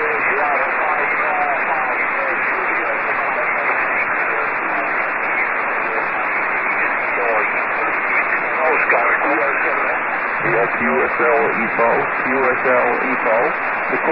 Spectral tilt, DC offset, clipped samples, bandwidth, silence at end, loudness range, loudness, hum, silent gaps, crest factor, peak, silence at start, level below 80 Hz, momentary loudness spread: -9.5 dB/octave; 0.5%; under 0.1%; 5.6 kHz; 0 s; 2 LU; -17 LUFS; none; none; 14 dB; -4 dBFS; 0 s; -58 dBFS; 3 LU